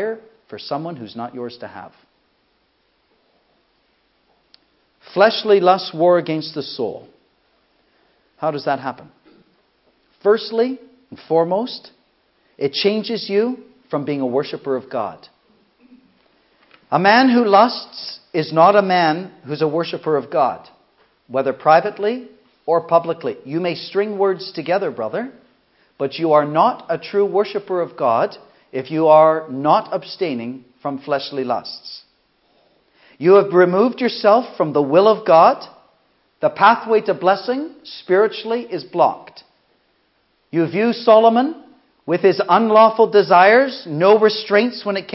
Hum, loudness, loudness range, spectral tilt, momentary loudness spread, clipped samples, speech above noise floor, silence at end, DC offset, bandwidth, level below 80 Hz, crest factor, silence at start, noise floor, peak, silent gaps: none; -17 LUFS; 10 LU; -9 dB/octave; 17 LU; under 0.1%; 47 dB; 0 s; under 0.1%; 5.8 kHz; -72 dBFS; 18 dB; 0 s; -64 dBFS; 0 dBFS; none